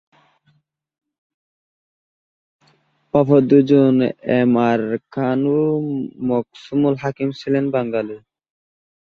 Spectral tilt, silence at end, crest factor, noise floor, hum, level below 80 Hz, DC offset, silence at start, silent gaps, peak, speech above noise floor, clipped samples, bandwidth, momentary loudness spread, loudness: -9 dB/octave; 1 s; 18 dB; -63 dBFS; none; -60 dBFS; under 0.1%; 3.15 s; none; -2 dBFS; 46 dB; under 0.1%; 6.6 kHz; 11 LU; -18 LUFS